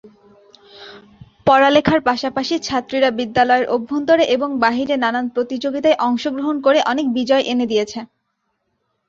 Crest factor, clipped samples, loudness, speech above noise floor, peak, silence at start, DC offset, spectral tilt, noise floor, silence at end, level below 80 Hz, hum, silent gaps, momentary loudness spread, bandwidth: 16 dB; under 0.1%; -17 LUFS; 54 dB; -2 dBFS; 0.05 s; under 0.1%; -4.5 dB/octave; -71 dBFS; 1.05 s; -52 dBFS; none; none; 7 LU; 7.6 kHz